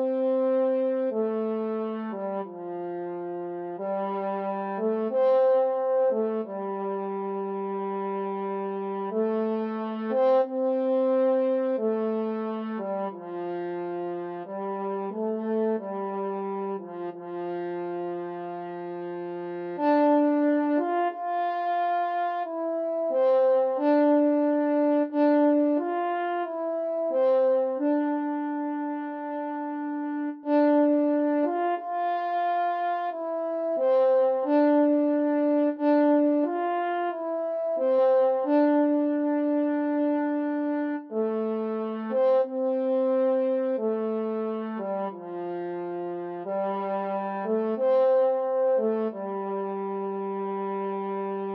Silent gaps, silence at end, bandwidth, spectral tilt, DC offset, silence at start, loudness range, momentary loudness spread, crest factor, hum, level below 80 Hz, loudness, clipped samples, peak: none; 0 s; 5 kHz; -9.5 dB/octave; under 0.1%; 0 s; 7 LU; 11 LU; 14 dB; none; under -90 dBFS; -26 LUFS; under 0.1%; -12 dBFS